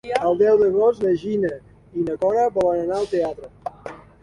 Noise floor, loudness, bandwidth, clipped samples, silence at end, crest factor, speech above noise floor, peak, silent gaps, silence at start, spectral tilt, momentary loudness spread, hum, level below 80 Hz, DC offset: -39 dBFS; -20 LUFS; 11 kHz; under 0.1%; 0.25 s; 18 dB; 20 dB; -4 dBFS; none; 0.05 s; -7 dB/octave; 18 LU; none; -54 dBFS; under 0.1%